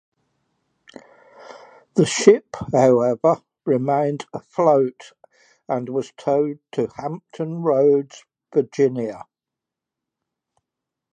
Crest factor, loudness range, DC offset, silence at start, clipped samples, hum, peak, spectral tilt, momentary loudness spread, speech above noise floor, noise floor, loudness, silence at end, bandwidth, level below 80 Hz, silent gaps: 22 dB; 5 LU; under 0.1%; 1.45 s; under 0.1%; none; 0 dBFS; -6 dB/octave; 14 LU; 67 dB; -86 dBFS; -20 LUFS; 1.95 s; 9.6 kHz; -62 dBFS; none